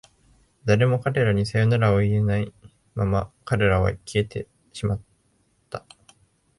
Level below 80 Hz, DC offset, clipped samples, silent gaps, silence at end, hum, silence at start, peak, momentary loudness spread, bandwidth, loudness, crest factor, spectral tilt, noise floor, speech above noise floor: -42 dBFS; under 0.1%; under 0.1%; none; 0.8 s; none; 0.65 s; -6 dBFS; 17 LU; 11.5 kHz; -23 LUFS; 18 dB; -7 dB/octave; -66 dBFS; 44 dB